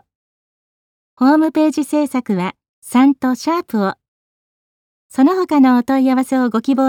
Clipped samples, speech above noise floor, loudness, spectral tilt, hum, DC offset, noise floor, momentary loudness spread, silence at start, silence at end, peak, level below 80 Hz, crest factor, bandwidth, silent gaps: under 0.1%; over 76 dB; -15 LUFS; -6 dB/octave; none; under 0.1%; under -90 dBFS; 8 LU; 1.2 s; 0 s; -2 dBFS; -64 dBFS; 14 dB; 16 kHz; 2.69-2.82 s, 4.08-5.09 s